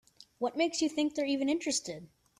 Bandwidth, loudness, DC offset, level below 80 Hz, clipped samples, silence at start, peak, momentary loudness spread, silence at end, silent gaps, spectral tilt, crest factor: 13 kHz; -32 LUFS; under 0.1%; -72 dBFS; under 0.1%; 0.4 s; -18 dBFS; 8 LU; 0.35 s; none; -2.5 dB/octave; 16 dB